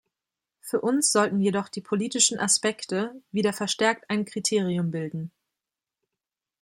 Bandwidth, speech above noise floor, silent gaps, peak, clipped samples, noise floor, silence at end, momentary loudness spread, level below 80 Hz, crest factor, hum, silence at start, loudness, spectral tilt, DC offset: 16.5 kHz; 63 dB; none; -6 dBFS; under 0.1%; -88 dBFS; 1.35 s; 10 LU; -72 dBFS; 20 dB; none; 0.65 s; -25 LUFS; -3.5 dB/octave; under 0.1%